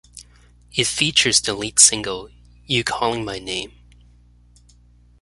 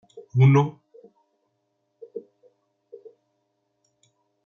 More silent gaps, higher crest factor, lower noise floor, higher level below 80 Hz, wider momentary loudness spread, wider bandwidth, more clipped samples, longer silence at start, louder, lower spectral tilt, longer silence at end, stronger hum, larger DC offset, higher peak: neither; about the same, 22 dB vs 20 dB; second, -52 dBFS vs -75 dBFS; first, -48 dBFS vs -72 dBFS; second, 16 LU vs 23 LU; first, 16 kHz vs 6.8 kHz; neither; about the same, 0.15 s vs 0.15 s; about the same, -18 LUFS vs -20 LUFS; second, -1 dB/octave vs -9 dB/octave; second, 1.55 s vs 2.25 s; first, 60 Hz at -45 dBFS vs none; neither; first, 0 dBFS vs -8 dBFS